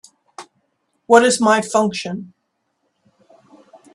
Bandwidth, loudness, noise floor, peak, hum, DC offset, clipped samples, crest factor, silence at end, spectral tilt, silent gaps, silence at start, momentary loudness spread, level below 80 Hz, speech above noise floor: 12.5 kHz; -16 LUFS; -71 dBFS; 0 dBFS; none; under 0.1%; under 0.1%; 20 dB; 1.7 s; -3.5 dB/octave; none; 0.4 s; 16 LU; -66 dBFS; 56 dB